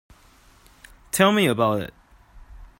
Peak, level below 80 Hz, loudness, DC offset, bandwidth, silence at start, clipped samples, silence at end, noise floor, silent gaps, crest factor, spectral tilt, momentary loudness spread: -2 dBFS; -50 dBFS; -21 LUFS; under 0.1%; 16.5 kHz; 1.15 s; under 0.1%; 0.15 s; -54 dBFS; none; 24 dB; -4.5 dB/octave; 11 LU